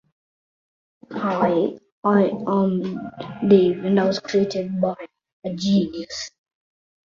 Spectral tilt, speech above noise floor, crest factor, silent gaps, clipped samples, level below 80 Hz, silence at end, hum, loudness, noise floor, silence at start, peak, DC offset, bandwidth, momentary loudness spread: -6.5 dB/octave; over 70 dB; 18 dB; 1.92-2.03 s, 5.33-5.42 s; under 0.1%; -60 dBFS; 0.75 s; none; -21 LUFS; under -90 dBFS; 1.1 s; -4 dBFS; under 0.1%; 7.4 kHz; 15 LU